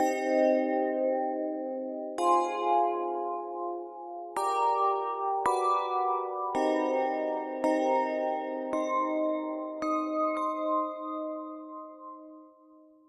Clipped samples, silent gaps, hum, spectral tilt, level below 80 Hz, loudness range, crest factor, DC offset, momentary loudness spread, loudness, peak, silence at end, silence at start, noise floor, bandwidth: under 0.1%; none; none; -3.5 dB/octave; -78 dBFS; 3 LU; 16 dB; under 0.1%; 11 LU; -30 LUFS; -14 dBFS; 0.6 s; 0 s; -57 dBFS; 12.5 kHz